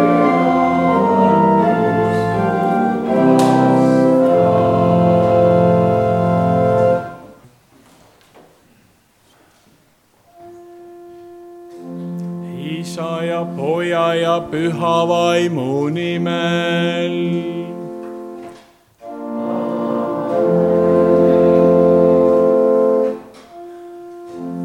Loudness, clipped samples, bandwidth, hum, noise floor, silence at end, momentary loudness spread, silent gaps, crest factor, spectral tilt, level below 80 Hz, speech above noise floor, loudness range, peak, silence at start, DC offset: -15 LUFS; under 0.1%; 12.5 kHz; none; -55 dBFS; 0 s; 18 LU; none; 14 dB; -7.5 dB/octave; -52 dBFS; 38 dB; 11 LU; -2 dBFS; 0 s; under 0.1%